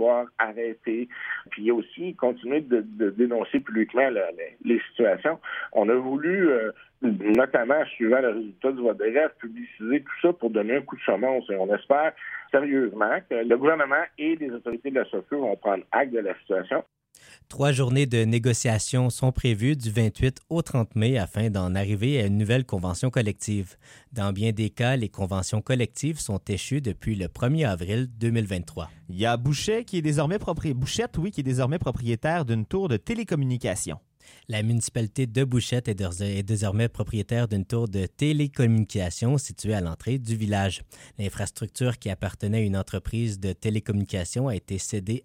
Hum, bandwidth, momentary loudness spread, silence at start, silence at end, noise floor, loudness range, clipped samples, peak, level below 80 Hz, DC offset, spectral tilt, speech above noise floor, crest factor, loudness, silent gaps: none; 16 kHz; 8 LU; 0 s; 0.05 s; -54 dBFS; 4 LU; under 0.1%; -6 dBFS; -48 dBFS; under 0.1%; -6 dB/octave; 29 dB; 18 dB; -26 LUFS; none